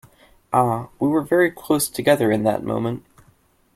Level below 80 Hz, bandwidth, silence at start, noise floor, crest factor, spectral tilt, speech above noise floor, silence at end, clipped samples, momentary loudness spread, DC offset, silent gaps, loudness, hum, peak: -56 dBFS; 16 kHz; 0.5 s; -58 dBFS; 20 dB; -5.5 dB/octave; 39 dB; 0.75 s; under 0.1%; 7 LU; under 0.1%; none; -20 LUFS; none; -2 dBFS